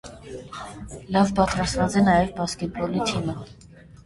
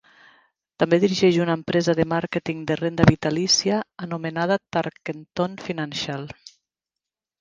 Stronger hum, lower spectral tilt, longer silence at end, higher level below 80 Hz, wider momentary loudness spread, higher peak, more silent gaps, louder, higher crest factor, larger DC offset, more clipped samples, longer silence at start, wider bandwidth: neither; about the same, -5.5 dB/octave vs -5 dB/octave; second, 0.05 s vs 0.9 s; first, -42 dBFS vs -48 dBFS; first, 19 LU vs 12 LU; second, -4 dBFS vs 0 dBFS; neither; about the same, -23 LUFS vs -22 LUFS; about the same, 20 dB vs 22 dB; neither; neither; second, 0.05 s vs 0.8 s; first, 11.5 kHz vs 9.6 kHz